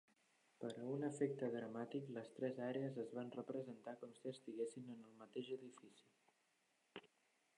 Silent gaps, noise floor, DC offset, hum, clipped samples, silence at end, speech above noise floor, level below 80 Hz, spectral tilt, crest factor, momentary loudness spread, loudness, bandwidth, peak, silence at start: none; -83 dBFS; under 0.1%; none; under 0.1%; 0.5 s; 35 dB; under -90 dBFS; -6.5 dB/octave; 22 dB; 18 LU; -48 LUFS; 11 kHz; -28 dBFS; 0.6 s